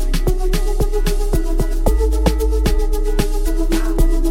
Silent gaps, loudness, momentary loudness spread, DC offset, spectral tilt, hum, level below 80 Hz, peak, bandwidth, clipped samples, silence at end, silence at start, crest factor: none; -20 LUFS; 3 LU; 0.4%; -6 dB/octave; none; -16 dBFS; -2 dBFS; 16 kHz; under 0.1%; 0 s; 0 s; 14 dB